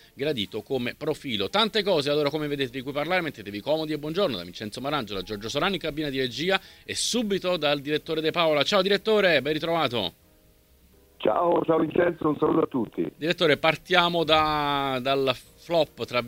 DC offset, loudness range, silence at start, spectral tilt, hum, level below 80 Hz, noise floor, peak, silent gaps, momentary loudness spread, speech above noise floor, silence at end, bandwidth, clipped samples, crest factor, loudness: under 0.1%; 5 LU; 0.15 s; -4.5 dB/octave; none; -54 dBFS; -58 dBFS; -4 dBFS; none; 9 LU; 33 dB; 0 s; 16 kHz; under 0.1%; 22 dB; -25 LUFS